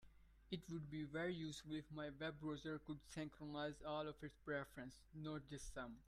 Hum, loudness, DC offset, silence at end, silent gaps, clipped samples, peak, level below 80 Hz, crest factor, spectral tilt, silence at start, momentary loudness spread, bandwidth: none; -50 LUFS; under 0.1%; 0 s; none; under 0.1%; -32 dBFS; -68 dBFS; 18 dB; -5.5 dB/octave; 0 s; 7 LU; 14 kHz